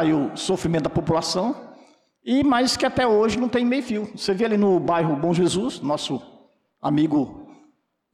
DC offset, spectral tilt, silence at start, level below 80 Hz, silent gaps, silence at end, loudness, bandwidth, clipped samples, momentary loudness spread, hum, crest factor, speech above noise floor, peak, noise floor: under 0.1%; -5.5 dB/octave; 0 s; -52 dBFS; none; 0.7 s; -22 LUFS; 13.5 kHz; under 0.1%; 9 LU; none; 10 dB; 41 dB; -12 dBFS; -62 dBFS